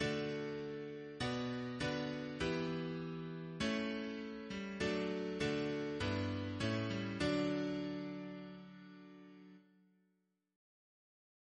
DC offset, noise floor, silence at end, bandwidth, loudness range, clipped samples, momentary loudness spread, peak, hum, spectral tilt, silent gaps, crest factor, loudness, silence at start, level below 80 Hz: under 0.1%; -82 dBFS; 1.95 s; 10 kHz; 10 LU; under 0.1%; 14 LU; -24 dBFS; none; -6 dB/octave; none; 18 dB; -41 LUFS; 0 s; -64 dBFS